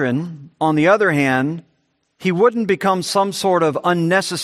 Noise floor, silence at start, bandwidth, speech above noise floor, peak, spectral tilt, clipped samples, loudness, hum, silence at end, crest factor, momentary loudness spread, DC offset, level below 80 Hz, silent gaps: -66 dBFS; 0 s; 14 kHz; 49 dB; -2 dBFS; -5.5 dB/octave; under 0.1%; -17 LUFS; none; 0 s; 16 dB; 10 LU; under 0.1%; -62 dBFS; none